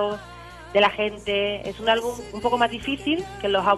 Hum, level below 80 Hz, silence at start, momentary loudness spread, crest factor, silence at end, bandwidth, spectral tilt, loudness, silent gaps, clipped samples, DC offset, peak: none; -48 dBFS; 0 s; 10 LU; 18 dB; 0 s; 13 kHz; -4.5 dB/octave; -24 LUFS; none; under 0.1%; under 0.1%; -6 dBFS